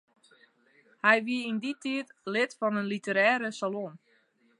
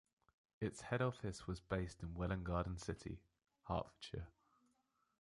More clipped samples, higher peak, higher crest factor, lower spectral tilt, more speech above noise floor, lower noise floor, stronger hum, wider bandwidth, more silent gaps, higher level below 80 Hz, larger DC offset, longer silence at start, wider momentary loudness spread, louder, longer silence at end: neither; first, -6 dBFS vs -26 dBFS; about the same, 24 dB vs 20 dB; second, -4.5 dB/octave vs -6.5 dB/octave; about the same, 38 dB vs 39 dB; second, -67 dBFS vs -83 dBFS; neither; about the same, 11 kHz vs 11.5 kHz; neither; second, -86 dBFS vs -56 dBFS; neither; first, 1.05 s vs 0.6 s; about the same, 10 LU vs 12 LU; first, -28 LUFS vs -45 LUFS; second, 0.65 s vs 0.9 s